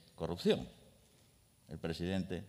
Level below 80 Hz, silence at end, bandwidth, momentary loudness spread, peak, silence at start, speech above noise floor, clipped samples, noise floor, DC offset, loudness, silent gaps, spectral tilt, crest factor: -64 dBFS; 0 s; 15.5 kHz; 16 LU; -18 dBFS; 0.2 s; 30 dB; under 0.1%; -67 dBFS; under 0.1%; -38 LUFS; none; -6.5 dB/octave; 22 dB